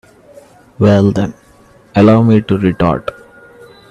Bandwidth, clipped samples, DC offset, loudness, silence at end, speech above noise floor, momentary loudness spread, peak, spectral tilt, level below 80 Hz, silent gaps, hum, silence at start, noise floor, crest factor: 8.6 kHz; under 0.1%; under 0.1%; -12 LUFS; 0.8 s; 35 dB; 12 LU; 0 dBFS; -8.5 dB/octave; -42 dBFS; none; none; 0.8 s; -45 dBFS; 14 dB